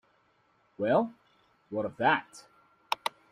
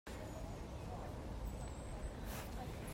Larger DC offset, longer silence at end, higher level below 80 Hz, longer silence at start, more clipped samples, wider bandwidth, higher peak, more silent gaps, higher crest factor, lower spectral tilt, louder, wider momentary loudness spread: neither; first, 0.2 s vs 0 s; second, -74 dBFS vs -50 dBFS; first, 0.8 s vs 0.05 s; neither; about the same, 15 kHz vs 16 kHz; first, -10 dBFS vs -34 dBFS; neither; first, 22 dB vs 14 dB; about the same, -5 dB/octave vs -5.5 dB/octave; first, -30 LUFS vs -48 LUFS; first, 11 LU vs 2 LU